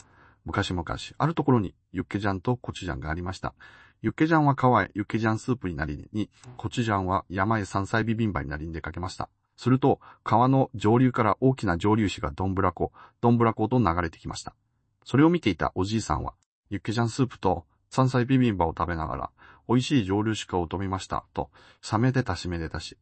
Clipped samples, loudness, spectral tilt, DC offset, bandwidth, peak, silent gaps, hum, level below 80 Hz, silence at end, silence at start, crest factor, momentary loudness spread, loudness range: under 0.1%; -26 LUFS; -7 dB/octave; under 0.1%; 8.8 kHz; -8 dBFS; 16.46-16.63 s; none; -46 dBFS; 0.1 s; 0.45 s; 18 dB; 13 LU; 4 LU